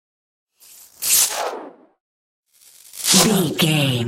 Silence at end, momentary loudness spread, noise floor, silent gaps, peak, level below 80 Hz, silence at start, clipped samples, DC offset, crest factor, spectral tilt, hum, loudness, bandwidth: 0 s; 16 LU; -49 dBFS; 2.00-2.43 s; -2 dBFS; -58 dBFS; 1 s; under 0.1%; under 0.1%; 20 dB; -3 dB/octave; none; -16 LUFS; 16.5 kHz